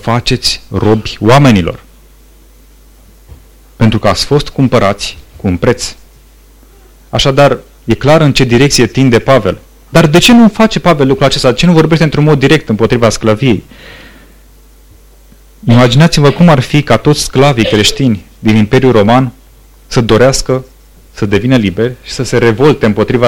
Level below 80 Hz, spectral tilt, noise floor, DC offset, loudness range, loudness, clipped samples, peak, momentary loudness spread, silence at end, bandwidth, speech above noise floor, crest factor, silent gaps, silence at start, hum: -30 dBFS; -5.5 dB/octave; -39 dBFS; 2%; 6 LU; -9 LUFS; under 0.1%; 0 dBFS; 10 LU; 0 s; 18 kHz; 32 dB; 10 dB; none; 0.05 s; none